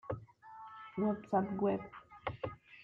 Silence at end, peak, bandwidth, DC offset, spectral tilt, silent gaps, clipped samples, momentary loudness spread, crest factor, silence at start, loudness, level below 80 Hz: 0 s; -20 dBFS; 4.9 kHz; under 0.1%; -9.5 dB/octave; none; under 0.1%; 18 LU; 18 dB; 0.05 s; -38 LUFS; -66 dBFS